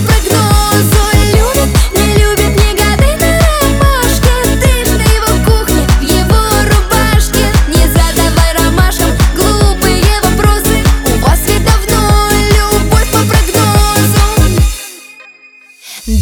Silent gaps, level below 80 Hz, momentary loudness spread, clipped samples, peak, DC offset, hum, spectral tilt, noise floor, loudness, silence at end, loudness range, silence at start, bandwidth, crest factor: none; -12 dBFS; 2 LU; under 0.1%; 0 dBFS; under 0.1%; none; -4.5 dB/octave; -39 dBFS; -9 LUFS; 0 s; 1 LU; 0 s; over 20 kHz; 8 dB